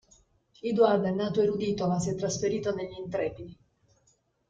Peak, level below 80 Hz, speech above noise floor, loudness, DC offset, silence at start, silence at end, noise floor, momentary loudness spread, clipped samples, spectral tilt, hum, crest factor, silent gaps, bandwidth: -8 dBFS; -60 dBFS; 42 dB; -28 LUFS; under 0.1%; 0.65 s; 0.95 s; -70 dBFS; 12 LU; under 0.1%; -6 dB/octave; none; 20 dB; none; 9.2 kHz